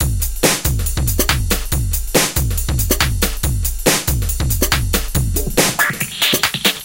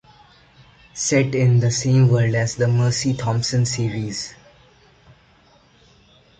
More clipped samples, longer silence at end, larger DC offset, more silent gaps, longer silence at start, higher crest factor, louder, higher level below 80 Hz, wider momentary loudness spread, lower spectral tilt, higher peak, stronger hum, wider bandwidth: neither; second, 0 s vs 2.05 s; first, 0.6% vs under 0.1%; neither; second, 0 s vs 0.95 s; about the same, 16 dB vs 16 dB; first, -16 LUFS vs -19 LUFS; first, -22 dBFS vs -50 dBFS; second, 5 LU vs 11 LU; second, -3 dB/octave vs -5.5 dB/octave; first, 0 dBFS vs -4 dBFS; neither; first, 17.5 kHz vs 9.2 kHz